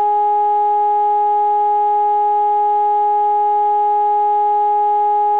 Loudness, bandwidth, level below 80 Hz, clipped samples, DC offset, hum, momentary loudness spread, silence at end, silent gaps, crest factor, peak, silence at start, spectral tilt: -15 LUFS; 4 kHz; -70 dBFS; under 0.1%; 0.4%; none; 0 LU; 0 s; none; 4 dB; -10 dBFS; 0 s; -6 dB/octave